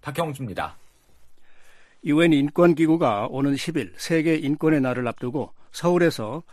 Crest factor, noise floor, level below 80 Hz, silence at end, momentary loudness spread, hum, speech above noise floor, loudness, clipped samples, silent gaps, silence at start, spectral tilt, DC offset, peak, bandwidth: 16 dB; -48 dBFS; -58 dBFS; 0 s; 13 LU; none; 26 dB; -22 LUFS; under 0.1%; none; 0.05 s; -6.5 dB/octave; under 0.1%; -6 dBFS; 14 kHz